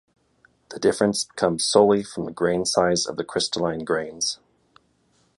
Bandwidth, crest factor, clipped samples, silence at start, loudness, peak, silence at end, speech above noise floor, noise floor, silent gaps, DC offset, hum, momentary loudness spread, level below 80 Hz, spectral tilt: 11.5 kHz; 22 dB; under 0.1%; 0.7 s; -22 LUFS; -2 dBFS; 1.05 s; 42 dB; -64 dBFS; none; under 0.1%; none; 9 LU; -58 dBFS; -3.5 dB/octave